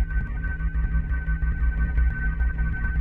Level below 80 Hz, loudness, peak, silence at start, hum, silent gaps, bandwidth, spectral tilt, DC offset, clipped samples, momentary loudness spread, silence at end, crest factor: -24 dBFS; -27 LUFS; -12 dBFS; 0 s; none; none; 3.1 kHz; -10 dB/octave; under 0.1%; under 0.1%; 4 LU; 0 s; 12 dB